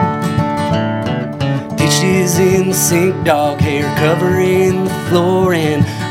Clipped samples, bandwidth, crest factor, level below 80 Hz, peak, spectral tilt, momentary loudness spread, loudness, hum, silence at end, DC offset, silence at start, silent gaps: under 0.1%; 16.5 kHz; 14 dB; -42 dBFS; 0 dBFS; -5 dB/octave; 6 LU; -14 LUFS; none; 0 s; under 0.1%; 0 s; none